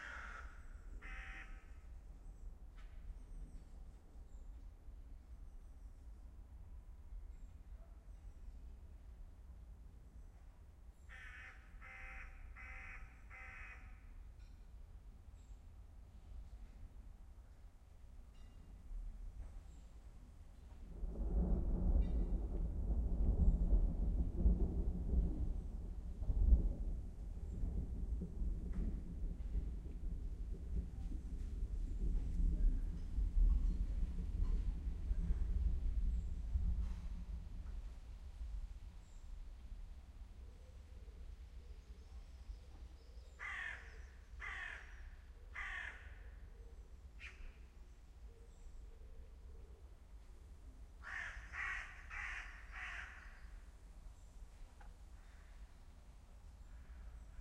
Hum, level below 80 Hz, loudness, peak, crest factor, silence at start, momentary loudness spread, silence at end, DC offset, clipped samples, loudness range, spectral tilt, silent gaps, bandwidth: none; -44 dBFS; -45 LUFS; -20 dBFS; 24 dB; 0 s; 21 LU; 0 s; under 0.1%; under 0.1%; 19 LU; -7 dB/octave; none; 8 kHz